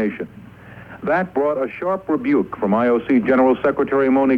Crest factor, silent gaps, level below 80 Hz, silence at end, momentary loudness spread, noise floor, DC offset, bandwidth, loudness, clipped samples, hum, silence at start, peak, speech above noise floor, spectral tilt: 14 dB; none; -52 dBFS; 0 s; 11 LU; -40 dBFS; under 0.1%; 4.8 kHz; -19 LUFS; under 0.1%; none; 0 s; -6 dBFS; 22 dB; -9 dB/octave